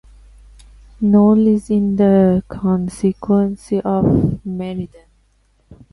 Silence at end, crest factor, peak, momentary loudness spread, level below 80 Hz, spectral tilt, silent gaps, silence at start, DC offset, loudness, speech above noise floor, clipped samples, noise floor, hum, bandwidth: 0.2 s; 16 dB; -2 dBFS; 12 LU; -40 dBFS; -9.5 dB/octave; none; 1 s; under 0.1%; -16 LUFS; 43 dB; under 0.1%; -58 dBFS; none; 11.5 kHz